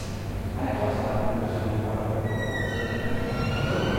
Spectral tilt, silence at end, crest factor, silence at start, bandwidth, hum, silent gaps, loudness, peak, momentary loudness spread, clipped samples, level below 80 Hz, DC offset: -6.5 dB/octave; 0 s; 14 dB; 0 s; 16.5 kHz; none; none; -28 LUFS; -14 dBFS; 3 LU; under 0.1%; -38 dBFS; under 0.1%